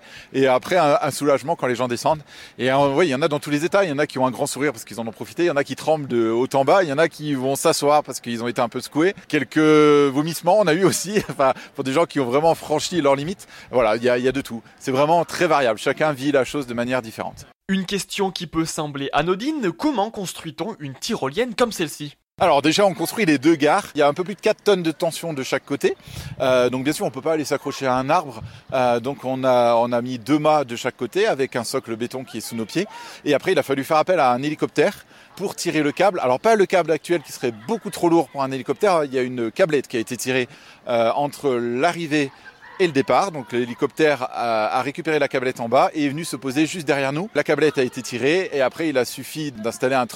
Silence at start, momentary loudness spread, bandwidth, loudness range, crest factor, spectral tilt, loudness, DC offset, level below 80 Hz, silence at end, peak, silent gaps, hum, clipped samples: 0.05 s; 10 LU; 16.5 kHz; 4 LU; 16 dB; -4.5 dB/octave; -21 LUFS; under 0.1%; -58 dBFS; 0 s; -4 dBFS; 17.55-17.60 s; none; under 0.1%